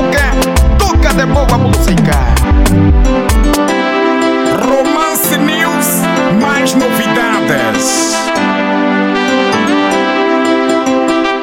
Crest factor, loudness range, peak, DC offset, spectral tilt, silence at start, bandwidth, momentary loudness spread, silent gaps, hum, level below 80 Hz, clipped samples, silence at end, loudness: 10 dB; 1 LU; 0 dBFS; under 0.1%; -5 dB/octave; 0 s; 17 kHz; 1 LU; none; none; -16 dBFS; under 0.1%; 0 s; -11 LUFS